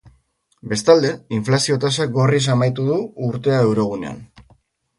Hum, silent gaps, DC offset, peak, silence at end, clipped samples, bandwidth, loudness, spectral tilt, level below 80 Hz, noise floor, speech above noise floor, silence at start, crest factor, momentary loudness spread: none; none; under 0.1%; 0 dBFS; 0.6 s; under 0.1%; 11.5 kHz; -18 LUFS; -5.5 dB/octave; -54 dBFS; -62 dBFS; 44 dB; 0.65 s; 18 dB; 11 LU